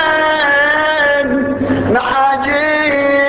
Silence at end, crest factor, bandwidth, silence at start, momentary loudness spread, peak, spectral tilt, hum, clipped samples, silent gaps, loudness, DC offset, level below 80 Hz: 0 s; 10 dB; 4 kHz; 0 s; 5 LU; -2 dBFS; -8.5 dB/octave; none; under 0.1%; none; -12 LUFS; under 0.1%; -40 dBFS